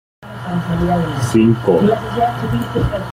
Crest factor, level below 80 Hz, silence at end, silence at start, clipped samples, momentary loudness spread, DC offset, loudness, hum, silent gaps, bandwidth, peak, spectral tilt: 14 dB; -34 dBFS; 0 s; 0.2 s; under 0.1%; 10 LU; under 0.1%; -16 LUFS; none; none; 16 kHz; -2 dBFS; -7.5 dB/octave